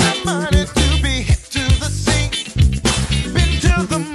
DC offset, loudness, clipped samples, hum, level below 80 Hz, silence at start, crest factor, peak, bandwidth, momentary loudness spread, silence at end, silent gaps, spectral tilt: under 0.1%; -17 LUFS; under 0.1%; none; -20 dBFS; 0 s; 14 dB; -2 dBFS; 12.5 kHz; 3 LU; 0 s; none; -4.5 dB/octave